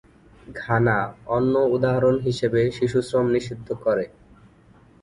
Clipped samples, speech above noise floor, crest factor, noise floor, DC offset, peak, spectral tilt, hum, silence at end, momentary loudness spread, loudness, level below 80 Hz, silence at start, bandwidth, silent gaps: under 0.1%; 31 dB; 18 dB; -53 dBFS; under 0.1%; -6 dBFS; -7 dB/octave; none; 0.95 s; 8 LU; -22 LUFS; -50 dBFS; 0.5 s; 11 kHz; none